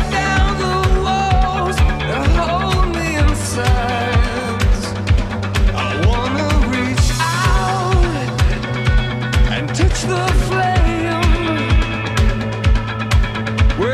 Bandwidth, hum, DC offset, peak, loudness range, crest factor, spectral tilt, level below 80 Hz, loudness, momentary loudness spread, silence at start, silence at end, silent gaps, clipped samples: 13.5 kHz; none; under 0.1%; -4 dBFS; 1 LU; 12 dB; -5.5 dB/octave; -18 dBFS; -17 LUFS; 2 LU; 0 s; 0 s; none; under 0.1%